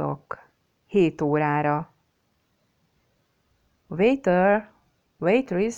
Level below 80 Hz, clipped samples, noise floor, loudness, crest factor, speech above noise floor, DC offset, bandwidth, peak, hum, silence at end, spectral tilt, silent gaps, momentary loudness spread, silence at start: -58 dBFS; under 0.1%; -70 dBFS; -23 LUFS; 16 dB; 48 dB; under 0.1%; 8.4 kHz; -8 dBFS; none; 0 s; -7 dB/octave; none; 16 LU; 0 s